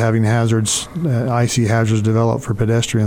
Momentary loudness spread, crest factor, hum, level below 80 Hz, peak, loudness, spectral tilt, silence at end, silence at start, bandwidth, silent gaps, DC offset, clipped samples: 3 LU; 10 dB; none; -42 dBFS; -6 dBFS; -17 LUFS; -5.5 dB/octave; 0 s; 0 s; 15.5 kHz; none; under 0.1%; under 0.1%